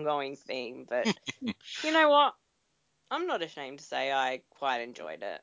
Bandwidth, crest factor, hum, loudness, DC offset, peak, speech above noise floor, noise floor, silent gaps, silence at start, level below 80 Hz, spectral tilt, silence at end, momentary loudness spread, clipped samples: 7.6 kHz; 20 dB; none; -30 LUFS; under 0.1%; -10 dBFS; 45 dB; -76 dBFS; none; 0 s; -78 dBFS; -3.5 dB/octave; 0.05 s; 15 LU; under 0.1%